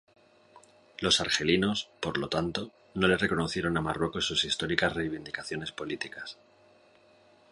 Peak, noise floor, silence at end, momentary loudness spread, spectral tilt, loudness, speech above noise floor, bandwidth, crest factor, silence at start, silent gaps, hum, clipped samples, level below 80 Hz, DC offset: -8 dBFS; -61 dBFS; 1.2 s; 12 LU; -4 dB/octave; -29 LUFS; 31 dB; 11.5 kHz; 24 dB; 0.55 s; none; none; under 0.1%; -54 dBFS; under 0.1%